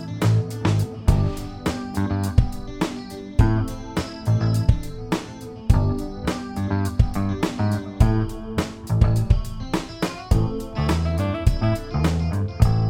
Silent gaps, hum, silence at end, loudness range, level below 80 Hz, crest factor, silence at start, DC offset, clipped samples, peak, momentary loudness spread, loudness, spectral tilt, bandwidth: none; none; 0 s; 1 LU; -28 dBFS; 20 dB; 0 s; under 0.1%; under 0.1%; -2 dBFS; 8 LU; -23 LUFS; -7 dB/octave; 15.5 kHz